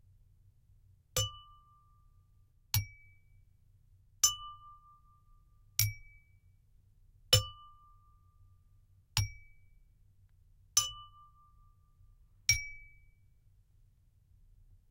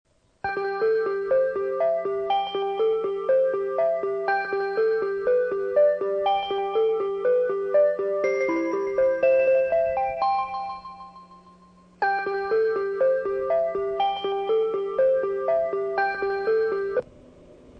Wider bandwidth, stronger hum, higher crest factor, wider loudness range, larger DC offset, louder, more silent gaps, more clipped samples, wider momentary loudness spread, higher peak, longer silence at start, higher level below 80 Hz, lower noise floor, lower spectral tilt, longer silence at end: first, 16 kHz vs 6 kHz; neither; first, 32 dB vs 14 dB; about the same, 5 LU vs 4 LU; neither; second, -32 LUFS vs -24 LUFS; neither; neither; first, 26 LU vs 6 LU; about the same, -8 dBFS vs -10 dBFS; first, 1.15 s vs 0.45 s; about the same, -56 dBFS vs -60 dBFS; first, -66 dBFS vs -53 dBFS; second, -1 dB/octave vs -5.5 dB/octave; first, 2.05 s vs 0 s